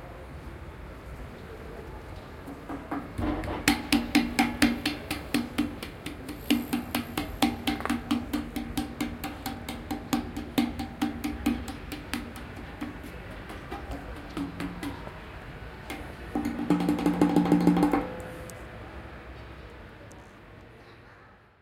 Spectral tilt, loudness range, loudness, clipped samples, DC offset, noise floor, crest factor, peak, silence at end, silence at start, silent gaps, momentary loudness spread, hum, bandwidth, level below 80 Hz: -5 dB/octave; 11 LU; -30 LUFS; under 0.1%; under 0.1%; -54 dBFS; 28 dB; -2 dBFS; 0.25 s; 0 s; none; 19 LU; none; 17 kHz; -46 dBFS